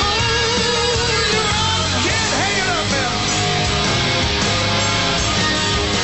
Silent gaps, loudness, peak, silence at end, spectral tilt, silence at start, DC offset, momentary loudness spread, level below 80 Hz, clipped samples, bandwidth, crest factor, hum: none; -16 LUFS; -4 dBFS; 0 s; -3 dB/octave; 0 s; 0.5%; 1 LU; -32 dBFS; under 0.1%; 8.4 kHz; 12 dB; none